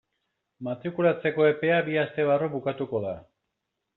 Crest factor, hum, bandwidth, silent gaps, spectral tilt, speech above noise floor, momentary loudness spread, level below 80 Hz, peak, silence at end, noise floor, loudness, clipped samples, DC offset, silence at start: 18 dB; none; 4.1 kHz; none; -5 dB/octave; 57 dB; 12 LU; -68 dBFS; -10 dBFS; 0.75 s; -82 dBFS; -26 LUFS; under 0.1%; under 0.1%; 0.6 s